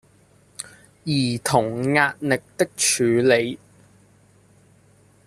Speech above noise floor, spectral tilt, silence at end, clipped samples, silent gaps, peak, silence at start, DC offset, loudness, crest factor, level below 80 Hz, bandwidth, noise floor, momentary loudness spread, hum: 35 dB; -4 dB/octave; 1.7 s; under 0.1%; none; -2 dBFS; 0.6 s; under 0.1%; -20 LUFS; 22 dB; -60 dBFS; 14 kHz; -56 dBFS; 19 LU; none